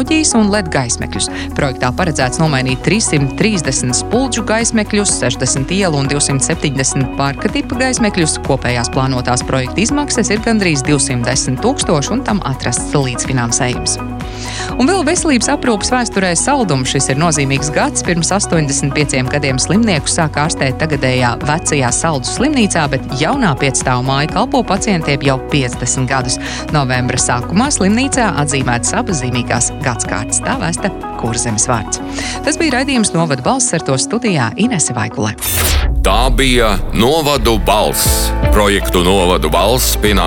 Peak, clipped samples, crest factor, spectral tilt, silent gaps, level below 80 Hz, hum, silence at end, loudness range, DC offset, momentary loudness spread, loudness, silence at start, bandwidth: 0 dBFS; under 0.1%; 14 dB; -4 dB/octave; none; -24 dBFS; none; 0 s; 3 LU; under 0.1%; 5 LU; -14 LUFS; 0 s; 17.5 kHz